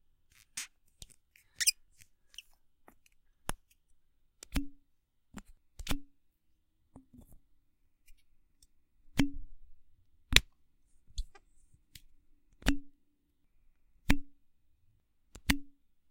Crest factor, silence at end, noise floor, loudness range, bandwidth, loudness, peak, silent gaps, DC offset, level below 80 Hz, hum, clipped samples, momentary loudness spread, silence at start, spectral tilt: 38 dB; 0.4 s; -72 dBFS; 14 LU; 16 kHz; -34 LUFS; 0 dBFS; none; under 0.1%; -46 dBFS; none; under 0.1%; 27 LU; 0.55 s; -2.5 dB/octave